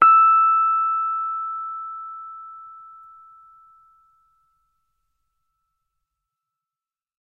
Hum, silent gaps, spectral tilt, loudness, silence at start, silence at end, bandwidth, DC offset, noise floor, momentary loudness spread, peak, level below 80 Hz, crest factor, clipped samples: none; none; -5 dB/octave; -18 LUFS; 0 s; 4.5 s; 3 kHz; under 0.1%; under -90 dBFS; 25 LU; -2 dBFS; -74 dBFS; 22 dB; under 0.1%